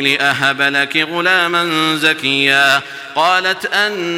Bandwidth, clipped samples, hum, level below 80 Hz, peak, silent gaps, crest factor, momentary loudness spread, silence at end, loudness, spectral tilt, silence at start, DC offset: 17 kHz; under 0.1%; none; -64 dBFS; 0 dBFS; none; 14 dB; 4 LU; 0 s; -13 LUFS; -3 dB/octave; 0 s; under 0.1%